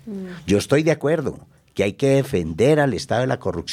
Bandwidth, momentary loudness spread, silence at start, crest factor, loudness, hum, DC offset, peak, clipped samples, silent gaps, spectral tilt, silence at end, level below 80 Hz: 15.5 kHz; 12 LU; 0.05 s; 16 dB; -20 LUFS; none; under 0.1%; -6 dBFS; under 0.1%; none; -6 dB/octave; 0 s; -48 dBFS